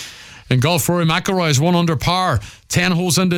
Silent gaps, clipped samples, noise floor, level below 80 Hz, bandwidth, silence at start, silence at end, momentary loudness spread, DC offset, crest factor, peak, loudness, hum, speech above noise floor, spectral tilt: none; under 0.1%; -36 dBFS; -40 dBFS; 17.5 kHz; 0 s; 0 s; 5 LU; under 0.1%; 14 dB; -2 dBFS; -17 LUFS; none; 20 dB; -4.5 dB/octave